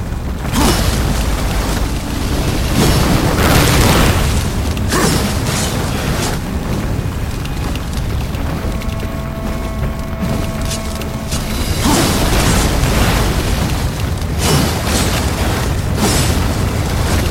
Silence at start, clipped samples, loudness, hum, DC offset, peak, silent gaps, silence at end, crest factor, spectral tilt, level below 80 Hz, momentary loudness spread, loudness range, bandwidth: 0 s; under 0.1%; -16 LUFS; none; under 0.1%; 0 dBFS; none; 0 s; 14 dB; -4.5 dB/octave; -20 dBFS; 9 LU; 7 LU; 16.5 kHz